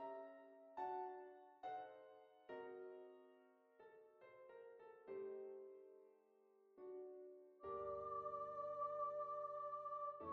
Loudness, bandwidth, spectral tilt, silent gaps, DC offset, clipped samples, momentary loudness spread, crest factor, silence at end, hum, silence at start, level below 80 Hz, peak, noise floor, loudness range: -52 LUFS; 6.6 kHz; -4.5 dB/octave; none; under 0.1%; under 0.1%; 19 LU; 16 dB; 0 s; none; 0 s; -86 dBFS; -36 dBFS; -75 dBFS; 10 LU